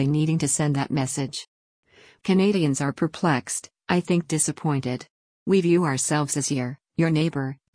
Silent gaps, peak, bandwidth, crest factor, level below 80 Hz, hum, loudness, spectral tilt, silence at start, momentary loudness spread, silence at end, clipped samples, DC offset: 1.48-1.83 s, 5.10-5.46 s; -8 dBFS; 10.5 kHz; 16 dB; -60 dBFS; none; -24 LUFS; -5 dB/octave; 0 s; 10 LU; 0.2 s; under 0.1%; under 0.1%